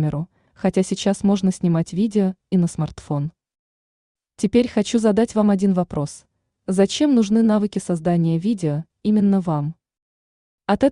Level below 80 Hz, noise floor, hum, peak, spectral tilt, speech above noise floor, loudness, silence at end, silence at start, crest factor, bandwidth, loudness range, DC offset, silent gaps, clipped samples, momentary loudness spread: -52 dBFS; under -90 dBFS; none; -4 dBFS; -7 dB/octave; over 71 dB; -20 LUFS; 0 s; 0 s; 16 dB; 11 kHz; 3 LU; under 0.1%; 3.59-4.15 s, 10.02-10.58 s; under 0.1%; 9 LU